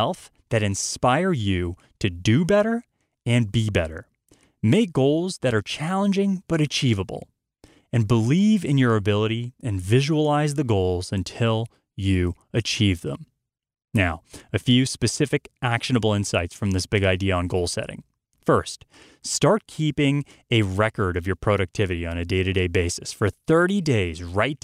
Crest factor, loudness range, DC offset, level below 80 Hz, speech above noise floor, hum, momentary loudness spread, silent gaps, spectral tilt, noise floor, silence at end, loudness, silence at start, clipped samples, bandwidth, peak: 16 dB; 2 LU; under 0.1%; -46 dBFS; 38 dB; none; 9 LU; none; -5.5 dB/octave; -60 dBFS; 0.05 s; -23 LUFS; 0 s; under 0.1%; 14.5 kHz; -6 dBFS